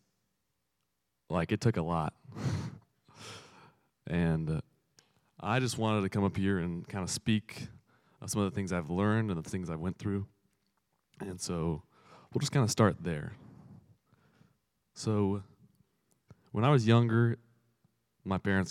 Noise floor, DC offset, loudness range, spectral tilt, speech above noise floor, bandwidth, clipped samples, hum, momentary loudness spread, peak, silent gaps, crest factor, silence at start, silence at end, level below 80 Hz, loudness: -82 dBFS; under 0.1%; 7 LU; -6 dB/octave; 52 dB; 14 kHz; under 0.1%; none; 18 LU; -12 dBFS; none; 22 dB; 1.3 s; 0 s; -62 dBFS; -32 LUFS